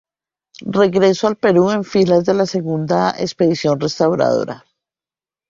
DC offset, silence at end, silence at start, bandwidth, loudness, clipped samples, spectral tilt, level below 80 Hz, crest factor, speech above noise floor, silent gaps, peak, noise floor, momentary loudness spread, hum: under 0.1%; 0.9 s; 0.6 s; 7.6 kHz; -16 LUFS; under 0.1%; -6 dB/octave; -56 dBFS; 14 dB; over 75 dB; none; -2 dBFS; under -90 dBFS; 7 LU; none